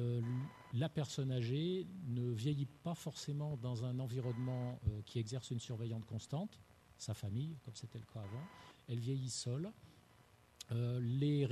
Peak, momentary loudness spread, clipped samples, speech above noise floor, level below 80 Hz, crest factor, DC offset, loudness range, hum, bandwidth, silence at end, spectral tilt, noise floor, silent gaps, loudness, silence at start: -24 dBFS; 11 LU; under 0.1%; 26 dB; -64 dBFS; 16 dB; under 0.1%; 5 LU; none; 13 kHz; 0 s; -6.5 dB/octave; -67 dBFS; none; -42 LUFS; 0 s